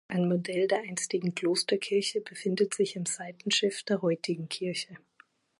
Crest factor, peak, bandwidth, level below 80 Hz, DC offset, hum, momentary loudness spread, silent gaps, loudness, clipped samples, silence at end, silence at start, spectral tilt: 16 dB; -14 dBFS; 11.5 kHz; -80 dBFS; under 0.1%; none; 6 LU; none; -30 LUFS; under 0.1%; 0.65 s; 0.1 s; -4 dB/octave